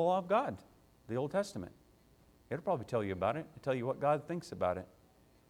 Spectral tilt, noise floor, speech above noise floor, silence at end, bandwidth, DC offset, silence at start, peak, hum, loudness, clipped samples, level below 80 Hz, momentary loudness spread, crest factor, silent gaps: -6.5 dB/octave; -65 dBFS; 30 dB; 0.65 s; 16 kHz; under 0.1%; 0 s; -18 dBFS; none; -36 LUFS; under 0.1%; -68 dBFS; 11 LU; 18 dB; none